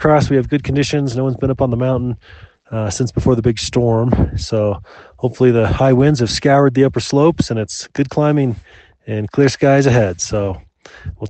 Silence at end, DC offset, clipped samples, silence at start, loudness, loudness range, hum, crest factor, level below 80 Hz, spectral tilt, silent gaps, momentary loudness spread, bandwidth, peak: 0 s; under 0.1%; under 0.1%; 0 s; -16 LUFS; 4 LU; none; 16 dB; -34 dBFS; -6.5 dB/octave; none; 12 LU; 8.8 kHz; 0 dBFS